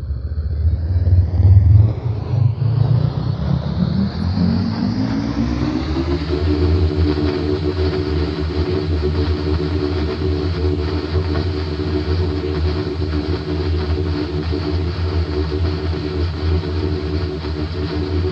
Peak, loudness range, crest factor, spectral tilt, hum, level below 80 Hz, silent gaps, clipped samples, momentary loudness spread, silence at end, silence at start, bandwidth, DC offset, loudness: 0 dBFS; 5 LU; 16 dB; -8.5 dB/octave; none; -28 dBFS; none; under 0.1%; 6 LU; 0 s; 0 s; 6.4 kHz; under 0.1%; -19 LUFS